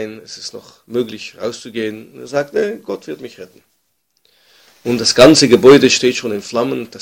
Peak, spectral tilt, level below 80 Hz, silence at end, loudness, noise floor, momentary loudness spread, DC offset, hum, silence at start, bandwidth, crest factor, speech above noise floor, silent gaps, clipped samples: 0 dBFS; -4 dB/octave; -50 dBFS; 0.05 s; -13 LUFS; -66 dBFS; 21 LU; under 0.1%; none; 0 s; 17 kHz; 16 dB; 51 dB; none; 1%